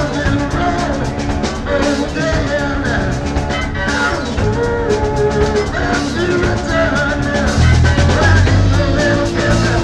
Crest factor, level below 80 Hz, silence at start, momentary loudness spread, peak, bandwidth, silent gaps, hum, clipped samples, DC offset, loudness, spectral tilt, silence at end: 14 dB; -22 dBFS; 0 s; 7 LU; 0 dBFS; 11 kHz; none; none; under 0.1%; under 0.1%; -15 LUFS; -6 dB/octave; 0 s